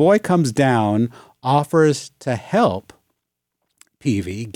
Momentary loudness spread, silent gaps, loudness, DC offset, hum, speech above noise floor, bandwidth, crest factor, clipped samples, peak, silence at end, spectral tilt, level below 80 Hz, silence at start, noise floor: 10 LU; none; -19 LUFS; under 0.1%; none; 61 dB; 16.5 kHz; 16 dB; under 0.1%; -4 dBFS; 0.05 s; -6.5 dB/octave; -62 dBFS; 0 s; -79 dBFS